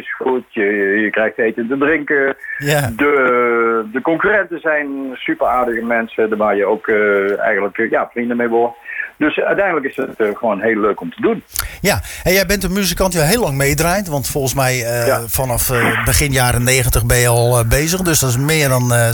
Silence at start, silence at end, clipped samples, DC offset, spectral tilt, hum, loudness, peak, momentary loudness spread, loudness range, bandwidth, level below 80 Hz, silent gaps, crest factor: 0 s; 0 s; under 0.1%; under 0.1%; -4.5 dB/octave; none; -15 LUFS; -2 dBFS; 6 LU; 4 LU; 19.5 kHz; -32 dBFS; none; 14 dB